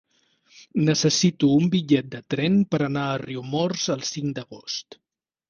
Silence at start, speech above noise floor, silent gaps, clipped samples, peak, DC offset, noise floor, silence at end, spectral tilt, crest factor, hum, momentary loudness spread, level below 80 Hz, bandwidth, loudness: 0.6 s; 39 dB; none; under 0.1%; -6 dBFS; under 0.1%; -62 dBFS; 0.7 s; -5 dB/octave; 16 dB; none; 12 LU; -60 dBFS; 9.8 kHz; -23 LUFS